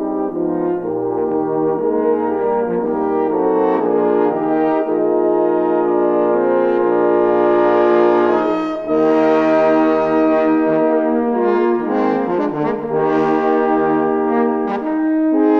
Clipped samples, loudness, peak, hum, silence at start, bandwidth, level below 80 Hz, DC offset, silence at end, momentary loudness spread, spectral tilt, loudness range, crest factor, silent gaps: under 0.1%; -16 LUFS; -2 dBFS; none; 0 s; 6.2 kHz; -54 dBFS; under 0.1%; 0 s; 5 LU; -8.5 dB/octave; 3 LU; 14 dB; none